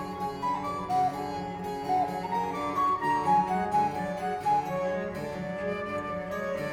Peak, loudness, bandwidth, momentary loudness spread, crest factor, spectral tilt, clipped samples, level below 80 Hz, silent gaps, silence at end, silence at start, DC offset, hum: -14 dBFS; -30 LUFS; 17.5 kHz; 9 LU; 16 dB; -6 dB/octave; under 0.1%; -56 dBFS; none; 0 s; 0 s; under 0.1%; none